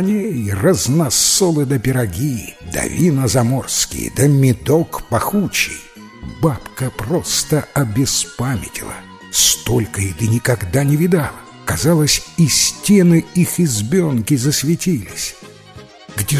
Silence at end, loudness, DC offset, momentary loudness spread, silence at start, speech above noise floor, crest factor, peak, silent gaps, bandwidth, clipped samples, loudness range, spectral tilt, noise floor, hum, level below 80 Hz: 0 s; -16 LUFS; under 0.1%; 12 LU; 0 s; 23 dB; 16 dB; 0 dBFS; none; 16 kHz; under 0.1%; 4 LU; -4.5 dB/octave; -39 dBFS; none; -38 dBFS